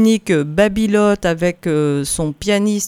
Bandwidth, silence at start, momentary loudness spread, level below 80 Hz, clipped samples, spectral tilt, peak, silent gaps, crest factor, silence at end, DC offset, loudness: 15 kHz; 0 s; 4 LU; -40 dBFS; under 0.1%; -5 dB/octave; 0 dBFS; none; 14 dB; 0 s; under 0.1%; -16 LUFS